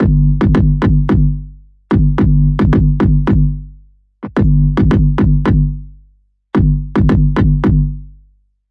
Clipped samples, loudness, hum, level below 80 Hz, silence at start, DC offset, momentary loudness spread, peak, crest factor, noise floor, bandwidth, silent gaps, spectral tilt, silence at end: under 0.1%; -13 LUFS; 50 Hz at -25 dBFS; -18 dBFS; 0 s; under 0.1%; 7 LU; 0 dBFS; 12 dB; -52 dBFS; 5 kHz; none; -10.5 dB/octave; 0.6 s